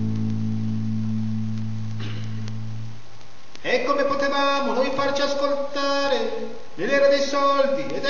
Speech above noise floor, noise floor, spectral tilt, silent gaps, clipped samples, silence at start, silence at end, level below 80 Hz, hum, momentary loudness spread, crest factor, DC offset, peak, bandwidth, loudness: 26 dB; -48 dBFS; -5.5 dB/octave; none; under 0.1%; 0 s; 0 s; -56 dBFS; none; 13 LU; 16 dB; 4%; -6 dBFS; 7.2 kHz; -23 LUFS